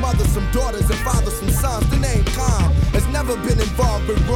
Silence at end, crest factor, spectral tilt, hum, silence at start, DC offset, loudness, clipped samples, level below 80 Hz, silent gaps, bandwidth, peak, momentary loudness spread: 0 s; 12 dB; -5.5 dB/octave; none; 0 s; under 0.1%; -19 LUFS; under 0.1%; -20 dBFS; none; 17 kHz; -6 dBFS; 3 LU